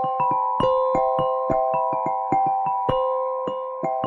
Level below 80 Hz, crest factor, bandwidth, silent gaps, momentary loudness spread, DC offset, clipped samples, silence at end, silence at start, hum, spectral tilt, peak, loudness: -50 dBFS; 14 dB; 7.4 kHz; none; 6 LU; under 0.1%; under 0.1%; 0 s; 0 s; none; -7.5 dB/octave; -8 dBFS; -22 LUFS